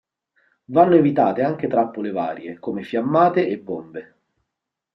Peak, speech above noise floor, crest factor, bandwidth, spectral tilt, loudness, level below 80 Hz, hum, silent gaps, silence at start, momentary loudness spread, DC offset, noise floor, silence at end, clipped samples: -2 dBFS; 63 dB; 18 dB; 5.8 kHz; -9.5 dB/octave; -20 LUFS; -66 dBFS; none; none; 0.7 s; 16 LU; under 0.1%; -83 dBFS; 0.95 s; under 0.1%